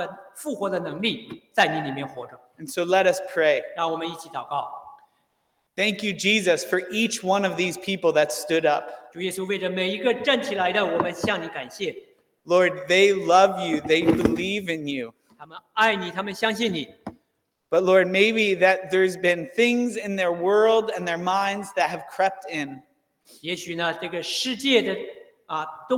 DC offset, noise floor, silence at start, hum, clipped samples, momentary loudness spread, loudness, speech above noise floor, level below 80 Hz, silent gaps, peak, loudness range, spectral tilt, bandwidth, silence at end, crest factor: under 0.1%; -74 dBFS; 0 s; none; under 0.1%; 14 LU; -23 LUFS; 51 dB; -62 dBFS; none; -4 dBFS; 5 LU; -4 dB/octave; 18.5 kHz; 0 s; 20 dB